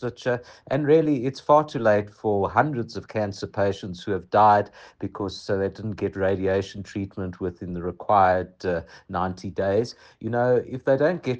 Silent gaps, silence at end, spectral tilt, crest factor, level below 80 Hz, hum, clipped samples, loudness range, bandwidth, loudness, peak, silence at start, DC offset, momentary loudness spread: none; 0 s; -7 dB/octave; 18 dB; -56 dBFS; none; under 0.1%; 3 LU; 8.6 kHz; -24 LUFS; -4 dBFS; 0 s; under 0.1%; 13 LU